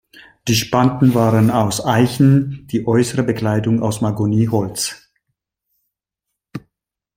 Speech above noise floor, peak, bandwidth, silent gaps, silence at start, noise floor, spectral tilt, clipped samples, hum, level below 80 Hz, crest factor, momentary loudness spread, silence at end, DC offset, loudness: 65 dB; 0 dBFS; 16.5 kHz; none; 0.15 s; -80 dBFS; -6 dB/octave; under 0.1%; none; -50 dBFS; 16 dB; 10 LU; 0.6 s; under 0.1%; -16 LUFS